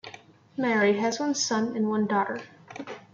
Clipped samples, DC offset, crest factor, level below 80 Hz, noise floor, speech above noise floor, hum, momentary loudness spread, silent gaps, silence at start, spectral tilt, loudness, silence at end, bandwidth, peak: under 0.1%; under 0.1%; 14 dB; -74 dBFS; -49 dBFS; 23 dB; none; 18 LU; none; 0.05 s; -4 dB/octave; -26 LUFS; 0.15 s; 7.8 kHz; -12 dBFS